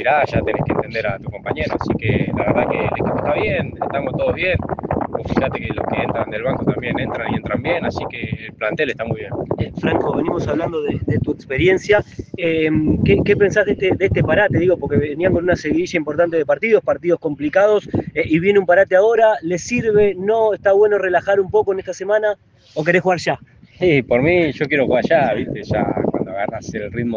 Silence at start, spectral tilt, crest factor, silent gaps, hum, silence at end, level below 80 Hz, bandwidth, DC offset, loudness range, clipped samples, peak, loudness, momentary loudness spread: 0 s; -7 dB/octave; 18 dB; none; none; 0 s; -40 dBFS; 7.6 kHz; under 0.1%; 6 LU; under 0.1%; 0 dBFS; -18 LUFS; 9 LU